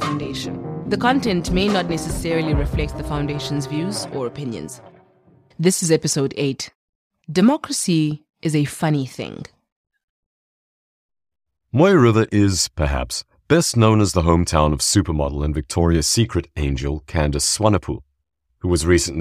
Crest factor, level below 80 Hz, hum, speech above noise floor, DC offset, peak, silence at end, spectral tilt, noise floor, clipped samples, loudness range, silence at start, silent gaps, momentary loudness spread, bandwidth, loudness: 18 dB; -32 dBFS; none; 53 dB; under 0.1%; -2 dBFS; 0 s; -5 dB/octave; -71 dBFS; under 0.1%; 7 LU; 0 s; 6.75-7.11 s, 9.72-9.84 s, 10.04-11.09 s; 13 LU; 15.5 kHz; -19 LUFS